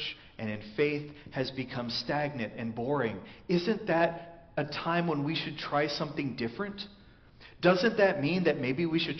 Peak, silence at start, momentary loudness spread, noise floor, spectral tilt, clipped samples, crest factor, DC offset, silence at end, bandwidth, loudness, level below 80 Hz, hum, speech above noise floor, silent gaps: -10 dBFS; 0 s; 12 LU; -55 dBFS; -4 dB/octave; under 0.1%; 20 dB; under 0.1%; 0 s; 6.4 kHz; -31 LUFS; -62 dBFS; none; 24 dB; none